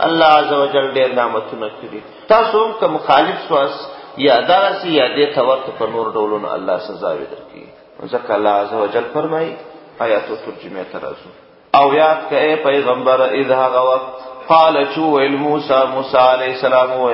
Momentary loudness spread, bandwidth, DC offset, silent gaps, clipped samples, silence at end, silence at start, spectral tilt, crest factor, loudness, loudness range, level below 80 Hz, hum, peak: 16 LU; 5.8 kHz; under 0.1%; none; under 0.1%; 0 s; 0 s; -7.5 dB/octave; 16 dB; -15 LUFS; 6 LU; -58 dBFS; none; 0 dBFS